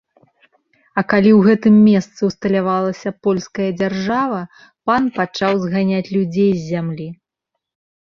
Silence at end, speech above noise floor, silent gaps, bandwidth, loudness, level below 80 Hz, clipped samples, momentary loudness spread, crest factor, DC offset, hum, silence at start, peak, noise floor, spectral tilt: 0.9 s; 63 dB; none; 7 kHz; -17 LUFS; -56 dBFS; under 0.1%; 13 LU; 16 dB; under 0.1%; none; 0.95 s; -2 dBFS; -79 dBFS; -7.5 dB/octave